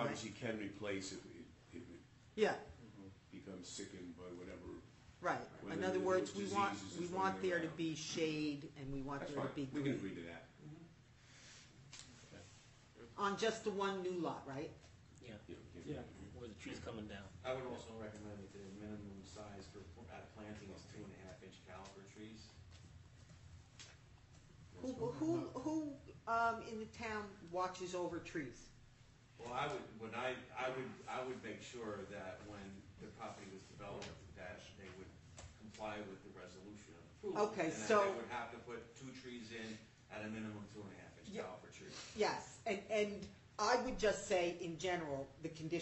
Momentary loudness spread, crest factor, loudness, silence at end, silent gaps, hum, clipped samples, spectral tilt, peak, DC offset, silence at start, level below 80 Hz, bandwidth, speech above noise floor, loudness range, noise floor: 20 LU; 24 dB; -44 LUFS; 0 s; none; none; under 0.1%; -4.5 dB/octave; -22 dBFS; under 0.1%; 0 s; -70 dBFS; 8.2 kHz; 22 dB; 13 LU; -65 dBFS